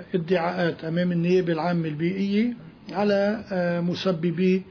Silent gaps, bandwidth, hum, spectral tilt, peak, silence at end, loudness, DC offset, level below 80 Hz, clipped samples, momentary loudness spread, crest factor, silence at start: none; 5.4 kHz; none; -8 dB/octave; -10 dBFS; 0 s; -24 LUFS; under 0.1%; -62 dBFS; under 0.1%; 4 LU; 14 dB; 0 s